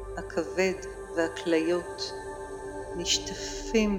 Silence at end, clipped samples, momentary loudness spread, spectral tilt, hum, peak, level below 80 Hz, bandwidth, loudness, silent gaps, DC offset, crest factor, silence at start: 0 s; under 0.1%; 12 LU; -3.5 dB/octave; none; -12 dBFS; -48 dBFS; 16 kHz; -30 LUFS; none; under 0.1%; 18 dB; 0 s